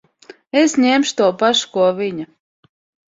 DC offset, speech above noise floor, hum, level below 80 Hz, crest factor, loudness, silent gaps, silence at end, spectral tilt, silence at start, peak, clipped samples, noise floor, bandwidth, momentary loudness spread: under 0.1%; 29 dB; none; -62 dBFS; 16 dB; -16 LUFS; none; 0.8 s; -3.5 dB/octave; 0.55 s; -2 dBFS; under 0.1%; -45 dBFS; 7.8 kHz; 11 LU